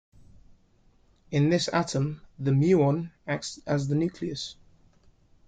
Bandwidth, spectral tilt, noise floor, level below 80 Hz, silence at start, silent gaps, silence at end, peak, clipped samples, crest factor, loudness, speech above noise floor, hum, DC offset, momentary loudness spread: 9.2 kHz; -6 dB/octave; -62 dBFS; -58 dBFS; 1.3 s; none; 0.95 s; -10 dBFS; under 0.1%; 18 dB; -27 LUFS; 36 dB; none; under 0.1%; 11 LU